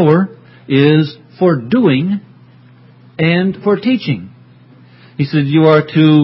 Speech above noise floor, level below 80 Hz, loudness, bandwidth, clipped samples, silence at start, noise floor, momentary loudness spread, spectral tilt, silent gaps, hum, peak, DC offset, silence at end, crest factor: 31 dB; -56 dBFS; -13 LUFS; 5.8 kHz; under 0.1%; 0 s; -42 dBFS; 12 LU; -10.5 dB/octave; none; none; 0 dBFS; under 0.1%; 0 s; 14 dB